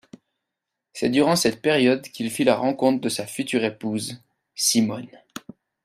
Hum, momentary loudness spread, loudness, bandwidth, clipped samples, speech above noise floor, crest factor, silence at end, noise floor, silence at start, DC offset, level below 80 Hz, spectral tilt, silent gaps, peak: none; 20 LU; -22 LUFS; 16 kHz; under 0.1%; 61 dB; 20 dB; 0.45 s; -83 dBFS; 0.95 s; under 0.1%; -64 dBFS; -3.5 dB/octave; none; -4 dBFS